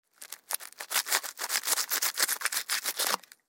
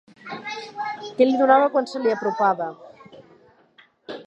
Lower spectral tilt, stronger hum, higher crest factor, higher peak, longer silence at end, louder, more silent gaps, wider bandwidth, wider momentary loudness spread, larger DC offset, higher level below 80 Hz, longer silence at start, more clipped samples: second, 3 dB/octave vs -5.5 dB/octave; neither; about the same, 26 dB vs 22 dB; second, -8 dBFS vs -2 dBFS; first, 0.3 s vs 0.05 s; second, -29 LUFS vs -21 LUFS; neither; first, 17 kHz vs 8.4 kHz; second, 9 LU vs 17 LU; neither; second, under -90 dBFS vs -78 dBFS; about the same, 0.2 s vs 0.25 s; neither